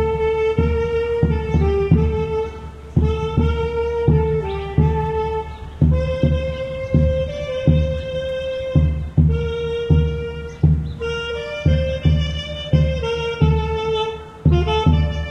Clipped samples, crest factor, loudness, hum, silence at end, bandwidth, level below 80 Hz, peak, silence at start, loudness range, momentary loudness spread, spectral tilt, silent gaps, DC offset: under 0.1%; 16 dB; -20 LUFS; none; 0 s; 7 kHz; -26 dBFS; -2 dBFS; 0 s; 1 LU; 7 LU; -8 dB/octave; none; under 0.1%